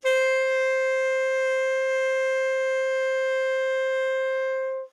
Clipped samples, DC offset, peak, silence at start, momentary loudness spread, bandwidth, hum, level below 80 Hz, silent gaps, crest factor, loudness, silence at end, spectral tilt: under 0.1%; under 0.1%; -12 dBFS; 0.05 s; 3 LU; 10.5 kHz; none; -86 dBFS; none; 12 dB; -24 LUFS; 0.05 s; 3 dB/octave